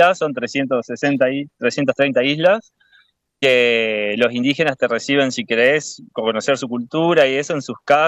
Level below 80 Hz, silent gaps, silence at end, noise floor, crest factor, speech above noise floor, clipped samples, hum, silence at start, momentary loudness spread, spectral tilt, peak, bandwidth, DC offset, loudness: -66 dBFS; none; 0 s; -57 dBFS; 14 dB; 39 dB; under 0.1%; none; 0 s; 7 LU; -4.5 dB/octave; -2 dBFS; 10 kHz; under 0.1%; -18 LUFS